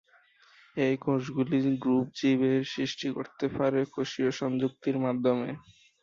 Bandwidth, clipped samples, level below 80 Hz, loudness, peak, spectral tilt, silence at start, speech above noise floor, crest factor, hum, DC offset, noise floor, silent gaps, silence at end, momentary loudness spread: 7.4 kHz; under 0.1%; -66 dBFS; -29 LUFS; -14 dBFS; -6.5 dB/octave; 0.75 s; 33 dB; 16 dB; none; under 0.1%; -61 dBFS; none; 0.45 s; 7 LU